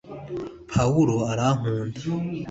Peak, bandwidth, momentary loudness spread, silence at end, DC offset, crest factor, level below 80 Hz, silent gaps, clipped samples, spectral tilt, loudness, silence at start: -8 dBFS; 8 kHz; 14 LU; 0 s; under 0.1%; 16 dB; -48 dBFS; none; under 0.1%; -7 dB/octave; -25 LUFS; 0.05 s